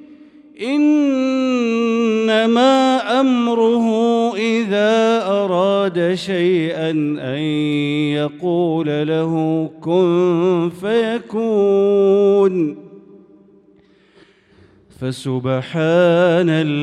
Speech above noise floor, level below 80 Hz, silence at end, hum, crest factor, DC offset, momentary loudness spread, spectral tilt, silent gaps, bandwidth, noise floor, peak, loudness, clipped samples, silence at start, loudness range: 36 dB; -64 dBFS; 0 s; none; 14 dB; under 0.1%; 8 LU; -6.5 dB/octave; none; 11 kHz; -52 dBFS; -4 dBFS; -16 LUFS; under 0.1%; 0 s; 4 LU